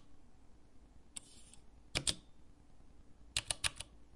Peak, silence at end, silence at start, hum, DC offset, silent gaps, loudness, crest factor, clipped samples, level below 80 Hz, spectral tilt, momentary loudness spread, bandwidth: -14 dBFS; 0 s; 0 s; none; under 0.1%; none; -40 LUFS; 32 dB; under 0.1%; -58 dBFS; -1 dB/octave; 23 LU; 11.5 kHz